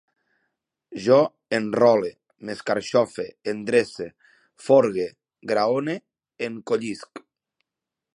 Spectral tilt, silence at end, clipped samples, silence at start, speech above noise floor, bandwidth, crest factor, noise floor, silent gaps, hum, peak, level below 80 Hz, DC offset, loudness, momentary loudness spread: -5.5 dB/octave; 1 s; under 0.1%; 0.9 s; 65 dB; 11 kHz; 20 dB; -87 dBFS; none; none; -4 dBFS; -68 dBFS; under 0.1%; -23 LUFS; 18 LU